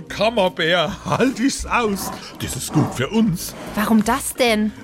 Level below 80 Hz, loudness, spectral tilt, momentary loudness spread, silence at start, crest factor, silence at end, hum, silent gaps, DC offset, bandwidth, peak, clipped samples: -42 dBFS; -20 LUFS; -4.5 dB/octave; 9 LU; 0 s; 14 dB; 0 s; none; none; under 0.1%; 16.5 kHz; -6 dBFS; under 0.1%